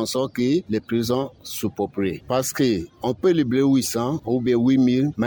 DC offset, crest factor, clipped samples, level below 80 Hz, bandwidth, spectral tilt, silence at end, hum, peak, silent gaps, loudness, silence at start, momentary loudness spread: under 0.1%; 12 dB; under 0.1%; -54 dBFS; 19.5 kHz; -5.5 dB/octave; 0 s; none; -8 dBFS; none; -22 LUFS; 0 s; 8 LU